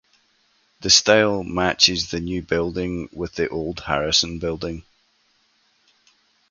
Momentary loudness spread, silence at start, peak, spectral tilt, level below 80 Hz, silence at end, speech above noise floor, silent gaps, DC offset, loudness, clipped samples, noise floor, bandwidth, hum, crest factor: 15 LU; 0.8 s; 0 dBFS; -2.5 dB/octave; -44 dBFS; 1.7 s; 42 dB; none; under 0.1%; -20 LUFS; under 0.1%; -64 dBFS; 10.5 kHz; none; 22 dB